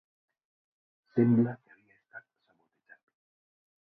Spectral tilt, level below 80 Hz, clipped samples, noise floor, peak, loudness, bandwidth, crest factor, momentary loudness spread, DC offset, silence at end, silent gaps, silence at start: -12.5 dB/octave; -76 dBFS; under 0.1%; -74 dBFS; -14 dBFS; -28 LUFS; 2.7 kHz; 20 dB; 26 LU; under 0.1%; 1.7 s; none; 1.15 s